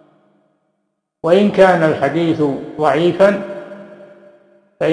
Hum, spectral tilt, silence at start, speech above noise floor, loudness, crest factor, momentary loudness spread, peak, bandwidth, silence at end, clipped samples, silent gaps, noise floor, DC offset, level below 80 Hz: none; -7 dB/octave; 1.25 s; 58 dB; -14 LUFS; 16 dB; 18 LU; 0 dBFS; 10.5 kHz; 0 s; under 0.1%; none; -71 dBFS; under 0.1%; -56 dBFS